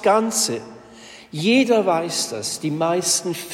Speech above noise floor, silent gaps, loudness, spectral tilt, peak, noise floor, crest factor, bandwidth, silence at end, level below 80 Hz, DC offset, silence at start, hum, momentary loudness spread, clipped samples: 23 dB; none; -20 LUFS; -3 dB/octave; -6 dBFS; -43 dBFS; 16 dB; 16.5 kHz; 0 s; -66 dBFS; under 0.1%; 0 s; none; 9 LU; under 0.1%